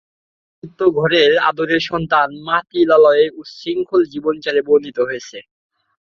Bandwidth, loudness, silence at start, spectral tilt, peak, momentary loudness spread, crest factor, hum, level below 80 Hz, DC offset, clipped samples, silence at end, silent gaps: 6.8 kHz; -16 LUFS; 0.65 s; -5.5 dB/octave; -2 dBFS; 11 LU; 16 dB; none; -56 dBFS; under 0.1%; under 0.1%; 0.7 s; none